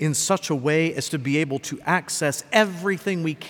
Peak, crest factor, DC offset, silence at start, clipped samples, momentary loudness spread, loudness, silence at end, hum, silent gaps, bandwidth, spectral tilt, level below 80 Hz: -4 dBFS; 20 dB; under 0.1%; 0 s; under 0.1%; 5 LU; -23 LUFS; 0 s; none; none; 19 kHz; -4 dB/octave; -68 dBFS